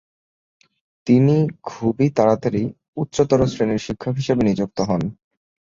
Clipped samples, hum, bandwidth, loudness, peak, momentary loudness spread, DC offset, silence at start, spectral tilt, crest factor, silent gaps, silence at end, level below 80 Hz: under 0.1%; none; 7.6 kHz; -20 LUFS; -2 dBFS; 9 LU; under 0.1%; 1.05 s; -7.5 dB/octave; 18 dB; 2.88-2.93 s; 0.65 s; -46 dBFS